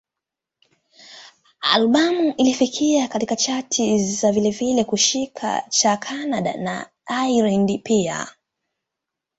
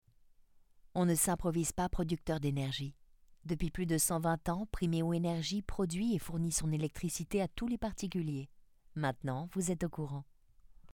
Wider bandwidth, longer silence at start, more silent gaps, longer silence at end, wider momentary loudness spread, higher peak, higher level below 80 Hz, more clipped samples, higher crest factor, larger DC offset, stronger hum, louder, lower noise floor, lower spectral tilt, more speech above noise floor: second, 8.2 kHz vs 19 kHz; first, 1.1 s vs 0.95 s; neither; first, 1.1 s vs 0.05 s; about the same, 8 LU vs 10 LU; first, -2 dBFS vs -18 dBFS; second, -60 dBFS vs -50 dBFS; neither; about the same, 20 dB vs 18 dB; neither; neither; first, -20 LUFS vs -36 LUFS; first, -86 dBFS vs -64 dBFS; second, -3.5 dB/octave vs -5 dB/octave; first, 66 dB vs 29 dB